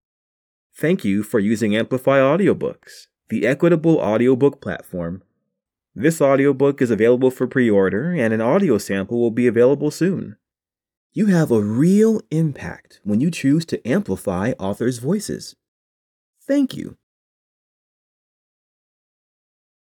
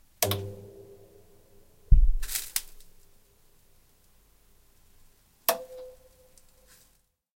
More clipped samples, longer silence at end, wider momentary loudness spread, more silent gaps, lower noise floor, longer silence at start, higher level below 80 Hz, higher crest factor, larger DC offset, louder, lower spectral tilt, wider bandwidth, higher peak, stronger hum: neither; first, 3 s vs 1.5 s; second, 13 LU vs 25 LU; first, 10.97-11.10 s, 15.68-16.33 s vs none; first, -90 dBFS vs -67 dBFS; first, 0.8 s vs 0.2 s; second, -58 dBFS vs -32 dBFS; second, 16 dB vs 26 dB; neither; first, -19 LUFS vs -29 LUFS; first, -7 dB/octave vs -3.5 dB/octave; first, 19.5 kHz vs 16.5 kHz; about the same, -4 dBFS vs -4 dBFS; neither